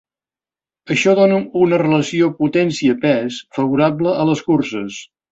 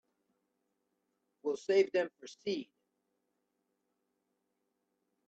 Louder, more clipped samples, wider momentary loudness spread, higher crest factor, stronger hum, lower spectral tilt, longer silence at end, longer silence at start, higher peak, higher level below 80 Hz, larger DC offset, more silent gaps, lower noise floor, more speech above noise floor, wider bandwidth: first, -16 LUFS vs -35 LUFS; neither; second, 9 LU vs 12 LU; second, 14 dB vs 22 dB; neither; first, -6 dB/octave vs -4.5 dB/octave; second, 0.3 s vs 2.65 s; second, 0.85 s vs 1.45 s; first, -2 dBFS vs -18 dBFS; first, -58 dBFS vs -86 dBFS; neither; neither; first, under -90 dBFS vs -83 dBFS; first, over 74 dB vs 50 dB; about the same, 8 kHz vs 8 kHz